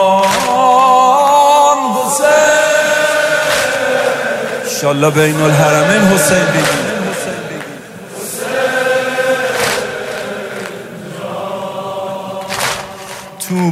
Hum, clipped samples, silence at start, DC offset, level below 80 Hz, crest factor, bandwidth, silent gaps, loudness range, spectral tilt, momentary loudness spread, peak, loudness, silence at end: none; under 0.1%; 0 s; under 0.1%; -50 dBFS; 14 dB; 16 kHz; none; 11 LU; -3.5 dB/octave; 16 LU; 0 dBFS; -12 LUFS; 0 s